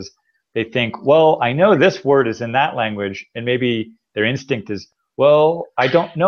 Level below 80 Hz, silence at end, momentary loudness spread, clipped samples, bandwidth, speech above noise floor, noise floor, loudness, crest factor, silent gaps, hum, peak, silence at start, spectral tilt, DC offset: -60 dBFS; 0 s; 14 LU; under 0.1%; 6.8 kHz; 29 dB; -45 dBFS; -17 LUFS; 16 dB; none; none; -2 dBFS; 0 s; -6.5 dB/octave; under 0.1%